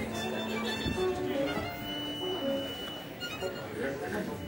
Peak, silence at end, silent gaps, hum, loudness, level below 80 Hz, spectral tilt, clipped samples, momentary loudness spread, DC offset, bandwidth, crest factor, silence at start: -20 dBFS; 0 s; none; none; -34 LUFS; -56 dBFS; -4.5 dB/octave; under 0.1%; 5 LU; under 0.1%; 16.5 kHz; 14 dB; 0 s